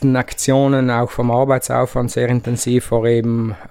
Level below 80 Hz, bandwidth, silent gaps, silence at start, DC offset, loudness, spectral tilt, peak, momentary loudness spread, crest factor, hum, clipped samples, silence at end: -40 dBFS; 16 kHz; none; 0 s; under 0.1%; -17 LUFS; -6 dB/octave; -2 dBFS; 4 LU; 14 dB; none; under 0.1%; 0 s